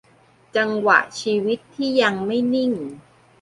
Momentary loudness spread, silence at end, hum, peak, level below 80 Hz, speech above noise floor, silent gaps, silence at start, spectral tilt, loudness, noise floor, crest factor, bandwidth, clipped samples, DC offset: 9 LU; 0.4 s; none; -2 dBFS; -64 dBFS; 35 dB; none; 0.55 s; -4.5 dB/octave; -20 LUFS; -55 dBFS; 20 dB; 11.5 kHz; under 0.1%; under 0.1%